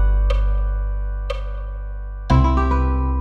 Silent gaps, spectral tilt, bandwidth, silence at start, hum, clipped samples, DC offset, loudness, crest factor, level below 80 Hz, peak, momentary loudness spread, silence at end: none; -8.5 dB/octave; 6 kHz; 0 s; 50 Hz at -30 dBFS; under 0.1%; under 0.1%; -21 LUFS; 16 dB; -20 dBFS; -4 dBFS; 14 LU; 0 s